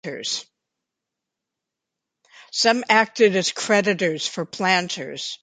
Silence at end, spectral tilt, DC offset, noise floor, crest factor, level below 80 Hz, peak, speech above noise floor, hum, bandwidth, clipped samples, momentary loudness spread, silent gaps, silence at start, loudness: 0.1 s; -3 dB/octave; under 0.1%; -84 dBFS; 22 dB; -72 dBFS; -2 dBFS; 63 dB; none; 9.6 kHz; under 0.1%; 11 LU; none; 0.05 s; -21 LUFS